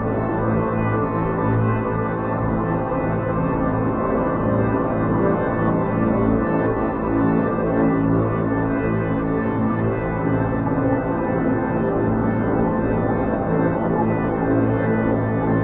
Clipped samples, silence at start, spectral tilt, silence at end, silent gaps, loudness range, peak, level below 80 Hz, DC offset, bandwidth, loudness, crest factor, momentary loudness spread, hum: under 0.1%; 0 s; -9.5 dB/octave; 0 s; none; 2 LU; -6 dBFS; -36 dBFS; under 0.1%; 3.9 kHz; -21 LUFS; 14 dB; 3 LU; none